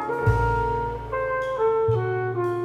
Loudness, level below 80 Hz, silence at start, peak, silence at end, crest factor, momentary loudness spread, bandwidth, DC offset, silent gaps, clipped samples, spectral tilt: -24 LUFS; -36 dBFS; 0 s; -6 dBFS; 0 s; 16 dB; 6 LU; 10 kHz; under 0.1%; none; under 0.1%; -8.5 dB/octave